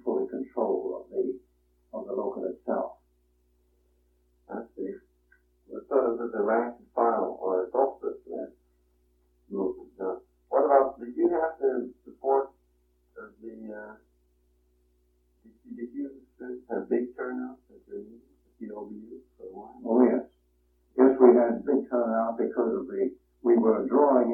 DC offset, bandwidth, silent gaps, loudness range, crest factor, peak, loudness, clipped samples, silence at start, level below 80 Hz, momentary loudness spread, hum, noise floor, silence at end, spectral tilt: under 0.1%; 2.5 kHz; none; 14 LU; 24 dB; -6 dBFS; -27 LUFS; under 0.1%; 0.05 s; -68 dBFS; 21 LU; none; -68 dBFS; 0 s; -11.5 dB/octave